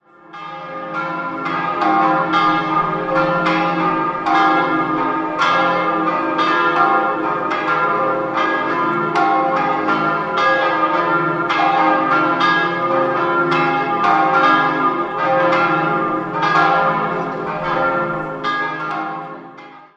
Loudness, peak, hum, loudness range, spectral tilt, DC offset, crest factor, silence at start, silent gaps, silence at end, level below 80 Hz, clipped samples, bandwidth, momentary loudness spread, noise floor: -16 LUFS; -2 dBFS; none; 2 LU; -6 dB/octave; under 0.1%; 16 dB; 0.3 s; none; 0.1 s; -54 dBFS; under 0.1%; 8.2 kHz; 8 LU; -38 dBFS